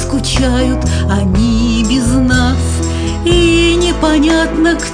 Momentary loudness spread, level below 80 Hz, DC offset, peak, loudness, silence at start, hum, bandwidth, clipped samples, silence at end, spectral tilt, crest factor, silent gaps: 5 LU; -18 dBFS; 0.2%; 0 dBFS; -12 LUFS; 0 s; none; 10 kHz; under 0.1%; 0 s; -5 dB/octave; 12 dB; none